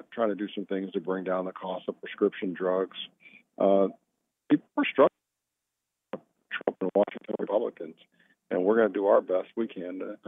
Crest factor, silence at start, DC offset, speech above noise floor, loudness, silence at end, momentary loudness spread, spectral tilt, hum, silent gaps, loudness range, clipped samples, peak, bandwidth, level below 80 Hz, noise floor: 20 dB; 0.1 s; under 0.1%; 58 dB; -28 LUFS; 0.15 s; 14 LU; -9 dB/octave; none; none; 4 LU; under 0.1%; -8 dBFS; 3.8 kHz; under -90 dBFS; -85 dBFS